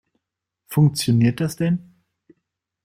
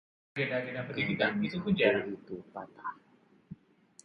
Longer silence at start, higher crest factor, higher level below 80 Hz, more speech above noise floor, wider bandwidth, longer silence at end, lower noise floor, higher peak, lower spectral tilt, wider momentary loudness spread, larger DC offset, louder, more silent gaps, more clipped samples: first, 0.7 s vs 0.35 s; second, 16 dB vs 22 dB; first, -56 dBFS vs -66 dBFS; first, 63 dB vs 29 dB; first, 16 kHz vs 10.5 kHz; first, 1.05 s vs 0.5 s; first, -81 dBFS vs -62 dBFS; first, -6 dBFS vs -12 dBFS; about the same, -6.5 dB/octave vs -6.5 dB/octave; second, 7 LU vs 24 LU; neither; first, -20 LUFS vs -32 LUFS; neither; neither